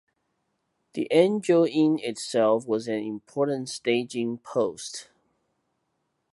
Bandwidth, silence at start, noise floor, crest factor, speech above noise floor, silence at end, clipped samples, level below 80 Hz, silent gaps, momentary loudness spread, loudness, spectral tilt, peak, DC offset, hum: 11.5 kHz; 0.95 s; -76 dBFS; 20 dB; 52 dB; 1.3 s; under 0.1%; -76 dBFS; none; 12 LU; -25 LUFS; -5 dB/octave; -6 dBFS; under 0.1%; none